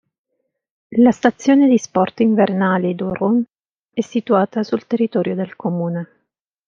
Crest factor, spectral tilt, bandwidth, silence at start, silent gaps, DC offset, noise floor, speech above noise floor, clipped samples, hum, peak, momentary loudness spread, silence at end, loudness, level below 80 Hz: 16 dB; -7 dB/octave; 7.4 kHz; 0.9 s; 3.60-3.64 s, 3.71-3.89 s; under 0.1%; -74 dBFS; 57 dB; under 0.1%; none; -2 dBFS; 10 LU; 0.65 s; -17 LUFS; -60 dBFS